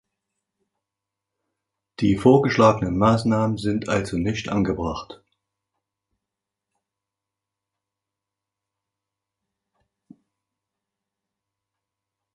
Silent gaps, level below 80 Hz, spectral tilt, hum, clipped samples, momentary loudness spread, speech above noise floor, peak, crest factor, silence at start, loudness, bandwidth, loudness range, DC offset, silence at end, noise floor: none; -48 dBFS; -7 dB/octave; none; under 0.1%; 9 LU; 66 dB; -2 dBFS; 24 dB; 2 s; -21 LUFS; 11.5 kHz; 11 LU; under 0.1%; 7.2 s; -86 dBFS